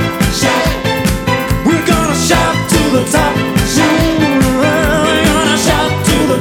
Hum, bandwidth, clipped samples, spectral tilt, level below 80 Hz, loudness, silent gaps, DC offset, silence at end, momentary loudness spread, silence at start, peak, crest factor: none; over 20 kHz; under 0.1%; -4.5 dB/octave; -24 dBFS; -12 LUFS; none; under 0.1%; 0 s; 3 LU; 0 s; 0 dBFS; 12 dB